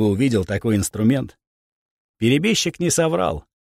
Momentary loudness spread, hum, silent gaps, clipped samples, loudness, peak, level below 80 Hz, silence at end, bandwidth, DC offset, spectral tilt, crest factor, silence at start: 6 LU; none; 1.47-2.14 s; under 0.1%; -20 LUFS; -6 dBFS; -46 dBFS; 0.2 s; 16 kHz; under 0.1%; -5 dB/octave; 14 dB; 0 s